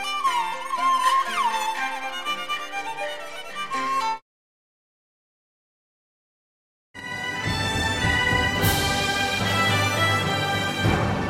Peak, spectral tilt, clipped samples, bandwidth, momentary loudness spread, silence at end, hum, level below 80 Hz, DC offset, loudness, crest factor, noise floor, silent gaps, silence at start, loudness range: -6 dBFS; -3.5 dB/octave; under 0.1%; 16.5 kHz; 10 LU; 0 s; none; -42 dBFS; under 0.1%; -23 LUFS; 18 dB; under -90 dBFS; 4.22-6.94 s; 0 s; 12 LU